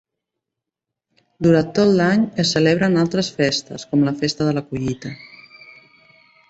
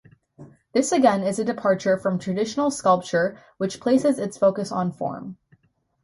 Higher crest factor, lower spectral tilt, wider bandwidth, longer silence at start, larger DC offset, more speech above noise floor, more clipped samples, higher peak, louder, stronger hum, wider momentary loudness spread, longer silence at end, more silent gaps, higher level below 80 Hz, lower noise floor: about the same, 18 dB vs 18 dB; about the same, -5.5 dB/octave vs -5.5 dB/octave; second, 8.2 kHz vs 11.5 kHz; first, 1.4 s vs 0.4 s; neither; first, 66 dB vs 40 dB; neither; about the same, -2 dBFS vs -4 dBFS; first, -18 LUFS vs -23 LUFS; neither; about the same, 10 LU vs 10 LU; first, 1.25 s vs 0.7 s; neither; first, -54 dBFS vs -64 dBFS; first, -84 dBFS vs -62 dBFS